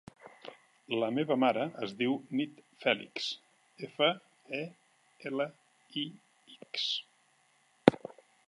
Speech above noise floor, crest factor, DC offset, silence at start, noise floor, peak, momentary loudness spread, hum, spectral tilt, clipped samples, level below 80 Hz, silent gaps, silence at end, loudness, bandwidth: 36 dB; 32 dB; under 0.1%; 0.25 s; -69 dBFS; -2 dBFS; 19 LU; none; -5 dB/octave; under 0.1%; -76 dBFS; none; 0.4 s; -33 LUFS; 11.5 kHz